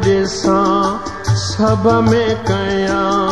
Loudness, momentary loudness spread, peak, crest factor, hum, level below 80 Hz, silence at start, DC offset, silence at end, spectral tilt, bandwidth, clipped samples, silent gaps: -15 LUFS; 5 LU; -2 dBFS; 12 dB; none; -36 dBFS; 0 s; 1%; 0 s; -6 dB/octave; 11 kHz; under 0.1%; none